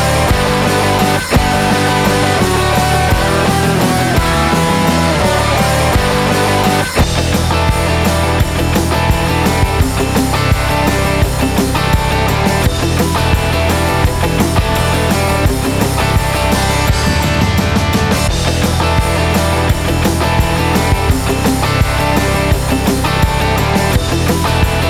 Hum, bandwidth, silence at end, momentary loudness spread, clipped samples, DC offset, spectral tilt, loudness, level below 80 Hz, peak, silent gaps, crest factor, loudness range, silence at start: none; 16 kHz; 0 s; 2 LU; under 0.1%; under 0.1%; -5 dB/octave; -13 LUFS; -20 dBFS; 0 dBFS; none; 12 dB; 1 LU; 0 s